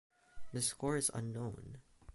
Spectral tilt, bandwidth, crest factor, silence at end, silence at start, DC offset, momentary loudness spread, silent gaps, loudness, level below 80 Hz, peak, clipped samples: -4 dB/octave; 12 kHz; 20 dB; 0 s; 0.1 s; under 0.1%; 18 LU; none; -38 LUFS; -62 dBFS; -22 dBFS; under 0.1%